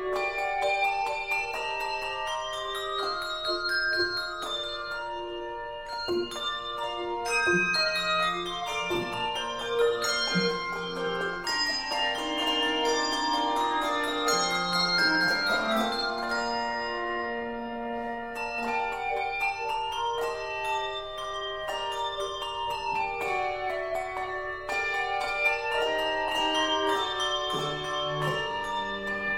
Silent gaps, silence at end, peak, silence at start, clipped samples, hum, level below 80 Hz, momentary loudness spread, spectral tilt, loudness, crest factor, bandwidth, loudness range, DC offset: none; 0 s; -12 dBFS; 0 s; under 0.1%; none; -54 dBFS; 8 LU; -2.5 dB/octave; -28 LUFS; 16 dB; 16 kHz; 5 LU; under 0.1%